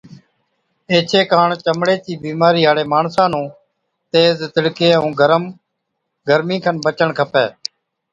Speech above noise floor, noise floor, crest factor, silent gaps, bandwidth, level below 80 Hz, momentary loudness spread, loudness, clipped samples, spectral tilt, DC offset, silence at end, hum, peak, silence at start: 59 dB; -74 dBFS; 16 dB; none; 7.8 kHz; -60 dBFS; 10 LU; -15 LUFS; under 0.1%; -5.5 dB/octave; under 0.1%; 0.6 s; none; 0 dBFS; 0.1 s